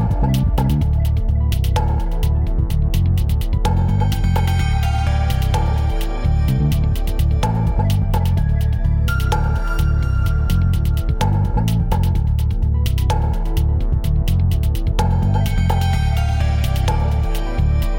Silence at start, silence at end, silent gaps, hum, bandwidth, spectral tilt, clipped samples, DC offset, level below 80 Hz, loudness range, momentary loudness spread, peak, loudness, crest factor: 0 s; 0 s; none; none; 17 kHz; -7 dB/octave; under 0.1%; under 0.1%; -18 dBFS; 1 LU; 2 LU; -4 dBFS; -19 LUFS; 12 dB